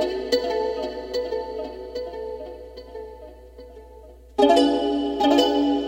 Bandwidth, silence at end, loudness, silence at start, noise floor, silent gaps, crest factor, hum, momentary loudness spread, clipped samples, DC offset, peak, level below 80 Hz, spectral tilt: 16.5 kHz; 0 s; -23 LUFS; 0 s; -45 dBFS; none; 20 dB; none; 22 LU; under 0.1%; under 0.1%; -4 dBFS; -48 dBFS; -4.5 dB/octave